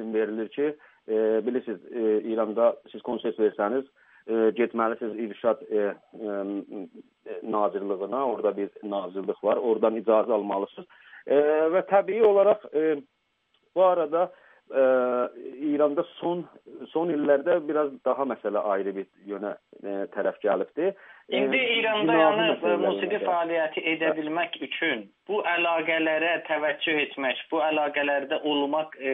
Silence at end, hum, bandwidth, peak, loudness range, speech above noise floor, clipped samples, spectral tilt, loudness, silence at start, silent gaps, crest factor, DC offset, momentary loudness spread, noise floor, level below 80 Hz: 0 s; none; 3.9 kHz; -6 dBFS; 5 LU; 46 dB; under 0.1%; -2 dB/octave; -26 LUFS; 0 s; none; 20 dB; under 0.1%; 11 LU; -71 dBFS; -82 dBFS